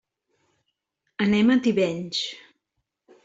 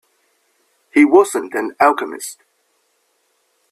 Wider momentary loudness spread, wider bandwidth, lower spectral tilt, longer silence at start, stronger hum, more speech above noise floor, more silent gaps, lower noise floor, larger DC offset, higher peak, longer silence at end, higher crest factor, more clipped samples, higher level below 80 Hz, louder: about the same, 17 LU vs 16 LU; second, 8 kHz vs 14 kHz; first, -5.5 dB/octave vs -3.5 dB/octave; first, 1.2 s vs 0.95 s; neither; first, 58 dB vs 50 dB; neither; first, -80 dBFS vs -64 dBFS; neither; second, -10 dBFS vs 0 dBFS; second, 0.9 s vs 1.4 s; about the same, 16 dB vs 18 dB; neither; about the same, -64 dBFS vs -66 dBFS; second, -23 LUFS vs -15 LUFS